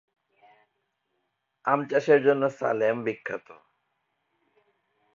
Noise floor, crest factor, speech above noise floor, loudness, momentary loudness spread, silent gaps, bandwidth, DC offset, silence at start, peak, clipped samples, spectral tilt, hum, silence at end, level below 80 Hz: -78 dBFS; 22 dB; 53 dB; -25 LUFS; 14 LU; none; 7.4 kHz; under 0.1%; 1.65 s; -8 dBFS; under 0.1%; -6.5 dB/octave; none; 1.8 s; -78 dBFS